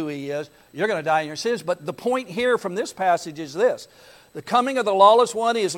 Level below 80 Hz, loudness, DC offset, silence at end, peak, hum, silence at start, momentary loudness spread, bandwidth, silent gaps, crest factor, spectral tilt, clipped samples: -66 dBFS; -22 LUFS; under 0.1%; 0 s; -2 dBFS; none; 0 s; 16 LU; 17 kHz; none; 20 dB; -4 dB/octave; under 0.1%